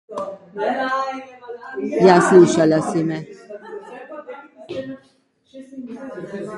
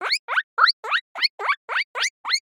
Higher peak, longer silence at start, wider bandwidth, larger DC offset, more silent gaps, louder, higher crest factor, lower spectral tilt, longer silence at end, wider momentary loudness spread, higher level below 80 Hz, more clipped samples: first, 0 dBFS vs -4 dBFS; about the same, 0.1 s vs 0 s; second, 11.5 kHz vs over 20 kHz; neither; second, none vs 0.19-0.28 s, 0.44-0.57 s, 0.73-0.83 s, 1.01-1.15 s, 1.30-1.38 s, 1.57-1.68 s, 1.84-1.94 s, 2.10-2.24 s; first, -17 LUFS vs -22 LUFS; about the same, 20 dB vs 20 dB; first, -6 dB/octave vs 5 dB/octave; about the same, 0 s vs 0.05 s; first, 25 LU vs 7 LU; first, -62 dBFS vs under -90 dBFS; neither